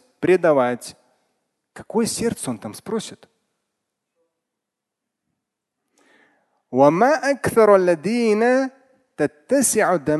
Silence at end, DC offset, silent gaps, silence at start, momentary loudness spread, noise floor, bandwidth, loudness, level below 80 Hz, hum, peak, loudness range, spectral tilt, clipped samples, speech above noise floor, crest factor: 0 s; under 0.1%; none; 0.2 s; 14 LU; -83 dBFS; 12.5 kHz; -19 LUFS; -58 dBFS; none; -2 dBFS; 16 LU; -4.5 dB/octave; under 0.1%; 64 dB; 20 dB